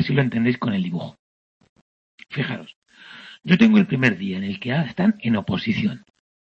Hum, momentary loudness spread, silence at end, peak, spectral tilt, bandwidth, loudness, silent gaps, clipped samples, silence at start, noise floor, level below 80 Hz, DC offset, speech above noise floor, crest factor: none; 18 LU; 0.45 s; -2 dBFS; -7.5 dB/octave; 6.8 kHz; -21 LUFS; 1.19-1.61 s, 1.69-2.18 s, 2.76-2.82 s; under 0.1%; 0 s; -43 dBFS; -58 dBFS; under 0.1%; 23 dB; 20 dB